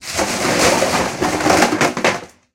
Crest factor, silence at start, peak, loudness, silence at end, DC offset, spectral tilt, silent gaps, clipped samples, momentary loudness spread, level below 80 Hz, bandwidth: 16 dB; 0 s; 0 dBFS; -16 LUFS; 0.3 s; under 0.1%; -3 dB/octave; none; under 0.1%; 5 LU; -42 dBFS; 17 kHz